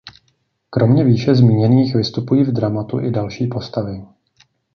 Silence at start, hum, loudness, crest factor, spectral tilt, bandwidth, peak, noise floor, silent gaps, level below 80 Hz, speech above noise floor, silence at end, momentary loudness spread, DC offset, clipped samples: 0.05 s; none; -16 LUFS; 14 dB; -8.5 dB/octave; 6.4 kHz; -2 dBFS; -64 dBFS; none; -50 dBFS; 49 dB; 0.7 s; 12 LU; under 0.1%; under 0.1%